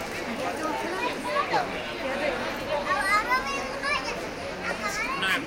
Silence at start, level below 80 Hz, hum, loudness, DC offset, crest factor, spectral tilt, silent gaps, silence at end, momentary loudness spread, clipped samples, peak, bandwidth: 0 s; -50 dBFS; none; -28 LUFS; under 0.1%; 16 dB; -3 dB/octave; none; 0 s; 8 LU; under 0.1%; -12 dBFS; 17 kHz